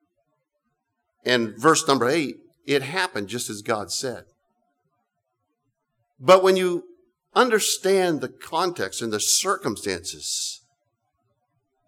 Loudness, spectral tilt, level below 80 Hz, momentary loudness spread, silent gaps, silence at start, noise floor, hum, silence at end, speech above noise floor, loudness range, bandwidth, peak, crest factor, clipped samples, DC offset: -22 LUFS; -3 dB/octave; -70 dBFS; 12 LU; none; 1.25 s; -77 dBFS; none; 1.3 s; 55 dB; 7 LU; 18.5 kHz; -4 dBFS; 20 dB; under 0.1%; under 0.1%